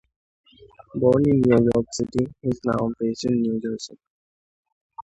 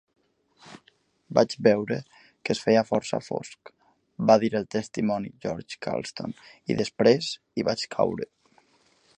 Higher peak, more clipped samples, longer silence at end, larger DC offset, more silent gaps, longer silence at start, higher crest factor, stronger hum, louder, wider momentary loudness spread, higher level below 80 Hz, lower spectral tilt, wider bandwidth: about the same, -4 dBFS vs -4 dBFS; neither; second, 0 s vs 0.95 s; neither; first, 4.07-4.63 s, 4.72-4.90 s vs none; first, 0.95 s vs 0.65 s; second, 18 dB vs 24 dB; neither; first, -22 LUFS vs -26 LUFS; about the same, 13 LU vs 14 LU; first, -52 dBFS vs -64 dBFS; first, -7 dB/octave vs -5.5 dB/octave; second, 8.8 kHz vs 9.8 kHz